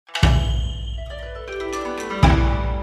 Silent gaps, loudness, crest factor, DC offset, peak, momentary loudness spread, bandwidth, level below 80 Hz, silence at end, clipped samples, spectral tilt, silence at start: none; -21 LUFS; 20 dB; under 0.1%; 0 dBFS; 15 LU; 11 kHz; -24 dBFS; 0 s; under 0.1%; -6 dB/octave; 0.1 s